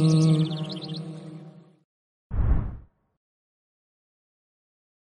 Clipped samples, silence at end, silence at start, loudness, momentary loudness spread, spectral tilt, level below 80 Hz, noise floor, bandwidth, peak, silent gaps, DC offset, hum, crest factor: under 0.1%; 2.25 s; 0 s; -26 LUFS; 22 LU; -7.5 dB/octave; -36 dBFS; -46 dBFS; 10.5 kHz; -12 dBFS; 1.84-2.30 s; under 0.1%; none; 16 dB